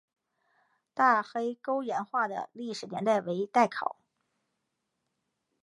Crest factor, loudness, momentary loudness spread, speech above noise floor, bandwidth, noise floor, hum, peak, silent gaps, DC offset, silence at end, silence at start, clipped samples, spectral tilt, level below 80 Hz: 22 dB; -30 LUFS; 12 LU; 53 dB; 11.5 kHz; -82 dBFS; none; -10 dBFS; none; under 0.1%; 1.7 s; 0.95 s; under 0.1%; -5 dB/octave; -84 dBFS